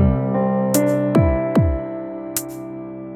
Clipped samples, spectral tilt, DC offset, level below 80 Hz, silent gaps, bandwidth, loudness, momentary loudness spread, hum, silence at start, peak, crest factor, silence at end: under 0.1%; -6.5 dB/octave; under 0.1%; -30 dBFS; none; 19 kHz; -19 LUFS; 14 LU; none; 0 s; 0 dBFS; 18 dB; 0 s